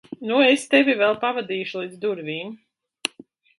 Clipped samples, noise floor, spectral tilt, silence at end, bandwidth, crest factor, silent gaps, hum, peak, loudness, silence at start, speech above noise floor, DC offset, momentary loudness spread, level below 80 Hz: under 0.1%; -50 dBFS; -3.5 dB/octave; 0.55 s; 11.5 kHz; 20 dB; none; none; -2 dBFS; -22 LUFS; 0.1 s; 29 dB; under 0.1%; 13 LU; -74 dBFS